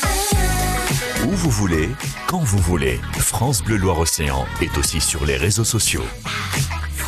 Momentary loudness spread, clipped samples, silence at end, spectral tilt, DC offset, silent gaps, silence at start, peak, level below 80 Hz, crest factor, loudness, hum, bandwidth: 5 LU; under 0.1%; 0 s; -4 dB/octave; under 0.1%; none; 0 s; -6 dBFS; -28 dBFS; 14 dB; -19 LUFS; none; 14 kHz